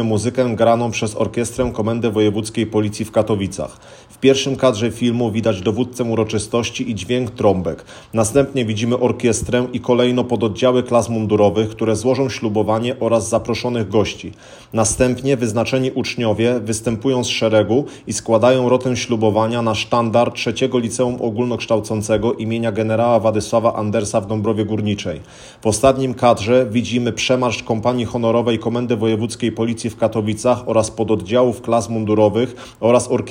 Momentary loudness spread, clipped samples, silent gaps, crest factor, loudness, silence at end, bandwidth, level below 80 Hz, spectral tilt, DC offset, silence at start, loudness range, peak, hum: 6 LU; under 0.1%; none; 16 dB; -18 LUFS; 0 s; 16 kHz; -46 dBFS; -5.5 dB/octave; under 0.1%; 0 s; 2 LU; 0 dBFS; none